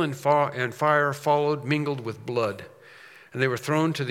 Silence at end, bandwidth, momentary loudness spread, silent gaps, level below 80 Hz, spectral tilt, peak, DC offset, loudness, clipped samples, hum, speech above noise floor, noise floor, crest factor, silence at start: 0 s; 16.5 kHz; 8 LU; none; -74 dBFS; -6 dB/octave; -8 dBFS; under 0.1%; -25 LUFS; under 0.1%; none; 24 dB; -49 dBFS; 18 dB; 0 s